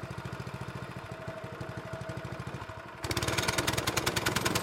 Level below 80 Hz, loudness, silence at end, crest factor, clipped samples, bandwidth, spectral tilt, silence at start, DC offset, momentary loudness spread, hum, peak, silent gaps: -52 dBFS; -34 LUFS; 0 s; 22 dB; under 0.1%; 16.5 kHz; -3.5 dB/octave; 0 s; under 0.1%; 12 LU; none; -12 dBFS; none